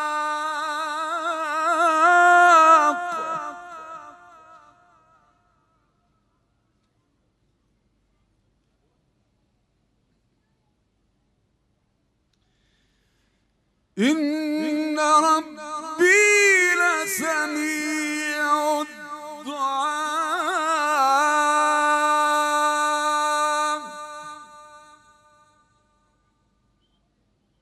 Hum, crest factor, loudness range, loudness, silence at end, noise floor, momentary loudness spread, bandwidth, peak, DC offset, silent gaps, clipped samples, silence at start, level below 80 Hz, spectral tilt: none; 20 dB; 12 LU; -20 LUFS; 2.85 s; -69 dBFS; 20 LU; 15.5 kHz; -4 dBFS; under 0.1%; none; under 0.1%; 0 s; -74 dBFS; -1.5 dB/octave